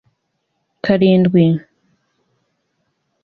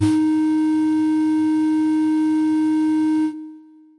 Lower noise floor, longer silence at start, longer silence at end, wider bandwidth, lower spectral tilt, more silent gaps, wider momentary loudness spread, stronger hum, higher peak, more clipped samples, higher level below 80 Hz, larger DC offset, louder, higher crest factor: first, -71 dBFS vs -43 dBFS; first, 0.85 s vs 0 s; first, 1.65 s vs 0.4 s; second, 4.9 kHz vs 11 kHz; first, -10 dB/octave vs -7 dB/octave; neither; first, 11 LU vs 3 LU; neither; first, 0 dBFS vs -6 dBFS; neither; first, -54 dBFS vs -68 dBFS; neither; first, -14 LUFS vs -19 LUFS; first, 18 dB vs 12 dB